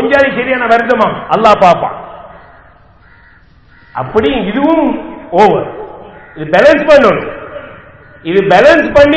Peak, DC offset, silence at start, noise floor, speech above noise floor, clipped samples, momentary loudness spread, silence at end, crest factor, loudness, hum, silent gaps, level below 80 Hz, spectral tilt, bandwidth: 0 dBFS; 0.3%; 0 s; -43 dBFS; 34 dB; 3%; 20 LU; 0 s; 10 dB; -9 LUFS; none; none; -38 dBFS; -6 dB/octave; 8 kHz